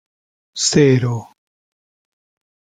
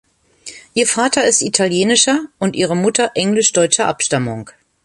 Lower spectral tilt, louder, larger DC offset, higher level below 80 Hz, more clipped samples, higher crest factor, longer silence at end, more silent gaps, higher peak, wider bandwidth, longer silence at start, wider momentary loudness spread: first, -4.5 dB/octave vs -3 dB/octave; about the same, -15 LUFS vs -15 LUFS; neither; about the same, -56 dBFS vs -56 dBFS; neither; about the same, 18 dB vs 16 dB; first, 1.55 s vs 0.35 s; neither; about the same, -2 dBFS vs 0 dBFS; second, 9.6 kHz vs 11.5 kHz; about the same, 0.55 s vs 0.45 s; first, 16 LU vs 10 LU